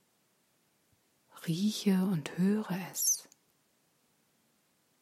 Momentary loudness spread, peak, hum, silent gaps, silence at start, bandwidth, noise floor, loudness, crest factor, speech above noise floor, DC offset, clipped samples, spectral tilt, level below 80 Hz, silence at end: 8 LU; -18 dBFS; none; none; 1.35 s; 16 kHz; -73 dBFS; -31 LUFS; 18 dB; 42 dB; under 0.1%; under 0.1%; -4.5 dB/octave; -84 dBFS; 1.8 s